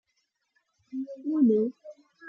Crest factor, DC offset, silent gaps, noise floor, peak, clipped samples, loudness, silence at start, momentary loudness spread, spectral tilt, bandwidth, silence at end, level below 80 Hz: 16 dB; under 0.1%; none; -77 dBFS; -14 dBFS; under 0.1%; -27 LUFS; 0.95 s; 15 LU; -10 dB/octave; 5.4 kHz; 0 s; -82 dBFS